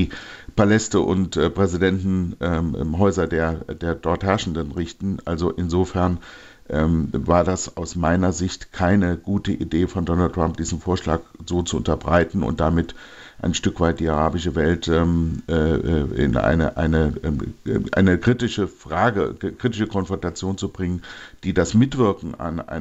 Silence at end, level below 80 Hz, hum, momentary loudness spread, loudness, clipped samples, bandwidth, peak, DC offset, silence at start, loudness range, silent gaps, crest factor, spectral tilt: 0 s; -38 dBFS; none; 9 LU; -22 LUFS; under 0.1%; 8.2 kHz; -4 dBFS; under 0.1%; 0 s; 3 LU; none; 18 dB; -6.5 dB/octave